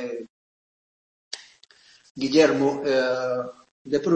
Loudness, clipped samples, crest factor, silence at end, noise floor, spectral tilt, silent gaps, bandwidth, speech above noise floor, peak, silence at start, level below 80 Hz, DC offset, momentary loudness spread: -23 LUFS; under 0.1%; 20 dB; 0 s; -55 dBFS; -5 dB/octave; 0.30-1.31 s, 2.10-2.15 s, 3.71-3.85 s; 8.6 kHz; 34 dB; -4 dBFS; 0 s; -66 dBFS; under 0.1%; 20 LU